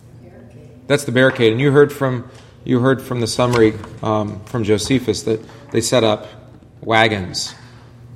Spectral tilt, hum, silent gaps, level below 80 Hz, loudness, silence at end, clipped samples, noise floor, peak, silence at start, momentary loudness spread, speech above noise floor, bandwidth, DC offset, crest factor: -5 dB/octave; none; none; -48 dBFS; -17 LUFS; 0 s; under 0.1%; -40 dBFS; 0 dBFS; 0.15 s; 11 LU; 24 dB; 15 kHz; under 0.1%; 18 dB